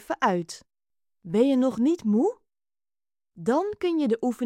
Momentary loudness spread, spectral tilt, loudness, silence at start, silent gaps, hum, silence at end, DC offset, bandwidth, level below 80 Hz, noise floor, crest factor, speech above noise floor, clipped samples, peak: 9 LU; -6.5 dB/octave; -25 LUFS; 0.1 s; none; none; 0 s; under 0.1%; 13.5 kHz; -68 dBFS; under -90 dBFS; 18 dB; over 66 dB; under 0.1%; -8 dBFS